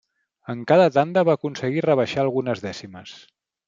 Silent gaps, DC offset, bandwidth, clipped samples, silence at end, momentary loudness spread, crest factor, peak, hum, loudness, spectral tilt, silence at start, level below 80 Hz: none; under 0.1%; 7.6 kHz; under 0.1%; 0.5 s; 22 LU; 18 dB; -4 dBFS; none; -20 LUFS; -6.5 dB/octave; 0.5 s; -66 dBFS